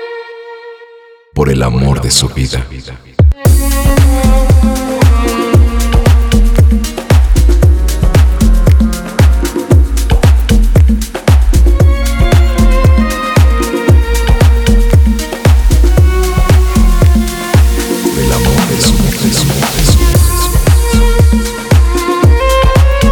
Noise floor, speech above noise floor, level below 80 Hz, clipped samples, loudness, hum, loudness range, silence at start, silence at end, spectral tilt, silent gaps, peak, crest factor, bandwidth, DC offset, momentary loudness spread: -38 dBFS; 29 dB; -10 dBFS; under 0.1%; -10 LUFS; none; 1 LU; 0 s; 0 s; -5.5 dB/octave; none; 0 dBFS; 8 dB; 20 kHz; under 0.1%; 4 LU